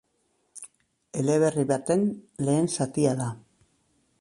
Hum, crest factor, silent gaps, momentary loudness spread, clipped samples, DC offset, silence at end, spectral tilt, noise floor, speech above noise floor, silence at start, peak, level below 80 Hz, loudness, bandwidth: none; 18 dB; none; 21 LU; under 0.1%; under 0.1%; 0.8 s; -6 dB/octave; -72 dBFS; 47 dB; 0.55 s; -10 dBFS; -64 dBFS; -26 LUFS; 11.5 kHz